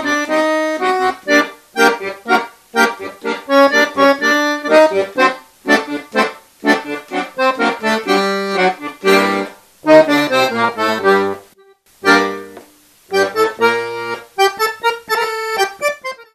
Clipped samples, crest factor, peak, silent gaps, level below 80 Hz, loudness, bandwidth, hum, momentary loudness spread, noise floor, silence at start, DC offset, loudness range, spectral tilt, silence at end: under 0.1%; 16 dB; 0 dBFS; none; -60 dBFS; -15 LUFS; 14 kHz; none; 11 LU; -49 dBFS; 0 s; under 0.1%; 3 LU; -3.5 dB/octave; 0.1 s